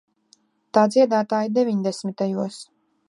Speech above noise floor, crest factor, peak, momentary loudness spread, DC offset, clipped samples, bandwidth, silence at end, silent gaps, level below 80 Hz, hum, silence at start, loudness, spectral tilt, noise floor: 40 dB; 20 dB; -4 dBFS; 11 LU; under 0.1%; under 0.1%; 11.5 kHz; 0.45 s; none; -78 dBFS; none; 0.75 s; -21 LUFS; -6 dB/octave; -61 dBFS